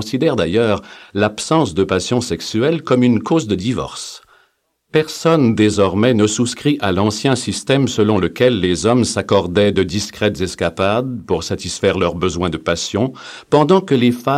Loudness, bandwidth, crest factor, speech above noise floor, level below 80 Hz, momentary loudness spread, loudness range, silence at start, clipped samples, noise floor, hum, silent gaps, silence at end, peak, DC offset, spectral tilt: -16 LUFS; 15 kHz; 16 dB; 46 dB; -44 dBFS; 7 LU; 3 LU; 0 s; under 0.1%; -62 dBFS; none; none; 0 s; 0 dBFS; under 0.1%; -5.5 dB/octave